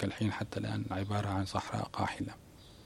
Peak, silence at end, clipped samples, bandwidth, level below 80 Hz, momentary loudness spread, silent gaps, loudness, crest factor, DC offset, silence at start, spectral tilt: -18 dBFS; 0 s; under 0.1%; 13 kHz; -60 dBFS; 8 LU; none; -36 LUFS; 18 dB; under 0.1%; 0 s; -6 dB/octave